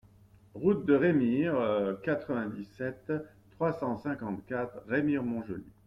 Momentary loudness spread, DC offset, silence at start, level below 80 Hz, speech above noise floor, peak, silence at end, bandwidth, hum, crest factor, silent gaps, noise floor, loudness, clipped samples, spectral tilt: 12 LU; under 0.1%; 0.55 s; -64 dBFS; 28 dB; -14 dBFS; 0.15 s; 5.8 kHz; none; 18 dB; none; -59 dBFS; -31 LUFS; under 0.1%; -9.5 dB/octave